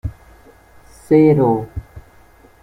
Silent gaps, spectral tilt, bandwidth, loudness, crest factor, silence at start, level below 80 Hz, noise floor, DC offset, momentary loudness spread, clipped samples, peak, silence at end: none; -9.5 dB/octave; 11.5 kHz; -14 LUFS; 16 dB; 0.05 s; -40 dBFS; -47 dBFS; under 0.1%; 20 LU; under 0.1%; -2 dBFS; 0.65 s